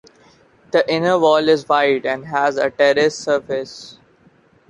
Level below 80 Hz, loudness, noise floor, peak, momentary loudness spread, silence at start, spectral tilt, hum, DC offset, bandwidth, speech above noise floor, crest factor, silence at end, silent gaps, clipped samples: -60 dBFS; -17 LUFS; -53 dBFS; -2 dBFS; 10 LU; 0.75 s; -4.5 dB/octave; none; under 0.1%; 10.5 kHz; 37 dB; 16 dB; 0.8 s; none; under 0.1%